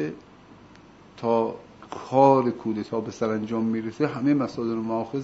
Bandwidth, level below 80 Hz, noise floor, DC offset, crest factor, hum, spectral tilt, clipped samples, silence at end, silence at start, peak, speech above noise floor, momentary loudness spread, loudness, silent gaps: 8 kHz; -64 dBFS; -50 dBFS; under 0.1%; 22 dB; none; -7.5 dB/octave; under 0.1%; 0 s; 0 s; -4 dBFS; 26 dB; 15 LU; -25 LUFS; none